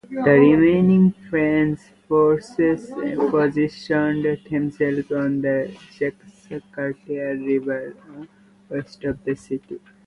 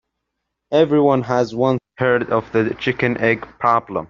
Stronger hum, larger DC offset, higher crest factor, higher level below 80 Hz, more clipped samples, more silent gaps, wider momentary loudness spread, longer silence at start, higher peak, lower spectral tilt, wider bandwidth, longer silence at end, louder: neither; neither; about the same, 18 dB vs 16 dB; about the same, -54 dBFS vs -54 dBFS; neither; neither; first, 16 LU vs 5 LU; second, 0.1 s vs 0.7 s; about the same, -2 dBFS vs -2 dBFS; first, -8.5 dB/octave vs -5 dB/octave; first, 10.5 kHz vs 7.2 kHz; first, 0.3 s vs 0.05 s; second, -21 LUFS vs -18 LUFS